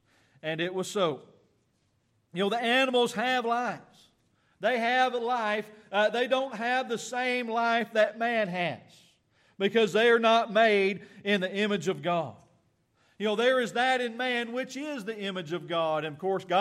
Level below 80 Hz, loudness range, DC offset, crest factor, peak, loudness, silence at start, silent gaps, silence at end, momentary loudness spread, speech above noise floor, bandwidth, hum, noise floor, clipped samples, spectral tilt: -80 dBFS; 4 LU; under 0.1%; 18 dB; -12 dBFS; -28 LUFS; 0.45 s; none; 0 s; 11 LU; 44 dB; 14 kHz; none; -72 dBFS; under 0.1%; -4.5 dB/octave